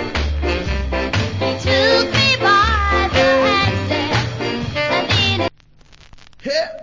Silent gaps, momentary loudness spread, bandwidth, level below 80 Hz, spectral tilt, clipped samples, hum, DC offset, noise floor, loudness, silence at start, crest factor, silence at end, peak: none; 8 LU; 7.6 kHz; -28 dBFS; -5 dB/octave; under 0.1%; none; under 0.1%; -47 dBFS; -16 LUFS; 0 s; 16 dB; 0 s; -2 dBFS